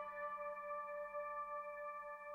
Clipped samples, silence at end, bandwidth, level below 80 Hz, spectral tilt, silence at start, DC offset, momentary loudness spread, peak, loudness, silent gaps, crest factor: under 0.1%; 0 s; 15.5 kHz; -80 dBFS; -4.5 dB/octave; 0 s; under 0.1%; 3 LU; -36 dBFS; -47 LUFS; none; 12 dB